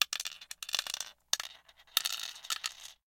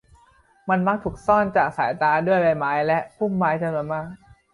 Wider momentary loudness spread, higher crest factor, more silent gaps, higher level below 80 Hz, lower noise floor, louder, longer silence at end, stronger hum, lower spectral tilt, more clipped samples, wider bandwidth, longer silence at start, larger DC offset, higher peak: about the same, 9 LU vs 9 LU; first, 32 dB vs 18 dB; neither; second, -76 dBFS vs -52 dBFS; about the same, -57 dBFS vs -57 dBFS; second, -35 LUFS vs -22 LUFS; second, 0.15 s vs 0.35 s; neither; second, 3.5 dB/octave vs -8 dB/octave; neither; first, 17 kHz vs 11 kHz; second, 0 s vs 0.65 s; neither; about the same, -6 dBFS vs -6 dBFS